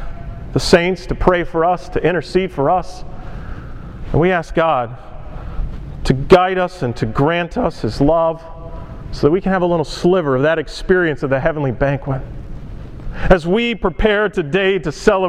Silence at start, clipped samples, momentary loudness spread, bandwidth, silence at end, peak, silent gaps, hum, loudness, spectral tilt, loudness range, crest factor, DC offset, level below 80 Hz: 0 s; under 0.1%; 19 LU; 12 kHz; 0 s; 0 dBFS; none; none; -16 LUFS; -6.5 dB/octave; 2 LU; 16 dB; under 0.1%; -28 dBFS